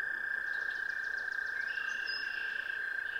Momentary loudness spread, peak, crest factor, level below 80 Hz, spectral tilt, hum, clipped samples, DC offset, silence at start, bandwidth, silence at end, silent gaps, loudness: 1 LU; -24 dBFS; 12 dB; -70 dBFS; -0.5 dB/octave; none; under 0.1%; under 0.1%; 0 s; 16.5 kHz; 0 s; none; -35 LUFS